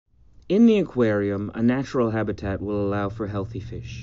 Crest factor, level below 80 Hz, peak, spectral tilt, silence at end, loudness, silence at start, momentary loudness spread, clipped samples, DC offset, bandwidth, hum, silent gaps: 16 dB; -46 dBFS; -8 dBFS; -7 dB/octave; 0 s; -23 LUFS; 0.5 s; 12 LU; under 0.1%; under 0.1%; 7.4 kHz; none; none